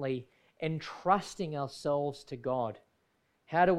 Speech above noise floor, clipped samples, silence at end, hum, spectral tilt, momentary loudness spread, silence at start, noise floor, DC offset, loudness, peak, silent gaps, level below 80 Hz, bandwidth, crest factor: 43 dB; under 0.1%; 0 s; none; -6 dB/octave; 9 LU; 0 s; -75 dBFS; under 0.1%; -34 LUFS; -12 dBFS; none; -66 dBFS; 12.5 kHz; 20 dB